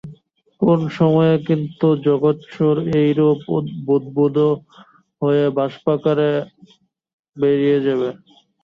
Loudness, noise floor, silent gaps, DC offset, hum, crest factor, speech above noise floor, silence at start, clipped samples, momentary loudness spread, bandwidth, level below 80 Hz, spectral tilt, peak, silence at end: -18 LUFS; -50 dBFS; 7.13-7.23 s; under 0.1%; none; 16 dB; 32 dB; 0.05 s; under 0.1%; 7 LU; 6.2 kHz; -58 dBFS; -9.5 dB/octave; -2 dBFS; 0.5 s